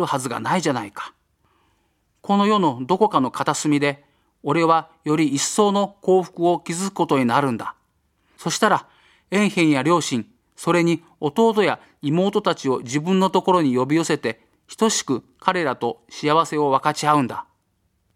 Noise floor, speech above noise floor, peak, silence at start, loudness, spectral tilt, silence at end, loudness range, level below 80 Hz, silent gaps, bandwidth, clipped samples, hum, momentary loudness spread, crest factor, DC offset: -68 dBFS; 48 dB; 0 dBFS; 0 s; -20 LUFS; -5 dB/octave; 0.75 s; 2 LU; -66 dBFS; none; 16 kHz; under 0.1%; none; 10 LU; 20 dB; under 0.1%